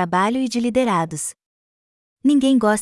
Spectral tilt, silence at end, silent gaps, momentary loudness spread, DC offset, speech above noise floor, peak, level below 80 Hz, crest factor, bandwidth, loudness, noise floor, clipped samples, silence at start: -5 dB/octave; 0 s; 1.46-2.17 s; 10 LU; under 0.1%; over 72 dB; -6 dBFS; -56 dBFS; 14 dB; 12 kHz; -19 LUFS; under -90 dBFS; under 0.1%; 0 s